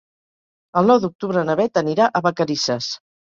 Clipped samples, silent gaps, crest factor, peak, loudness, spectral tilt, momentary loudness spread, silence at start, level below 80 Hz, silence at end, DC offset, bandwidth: under 0.1%; 1.15-1.19 s; 18 dB; -2 dBFS; -19 LUFS; -5 dB/octave; 9 LU; 0.75 s; -62 dBFS; 0.35 s; under 0.1%; 7.6 kHz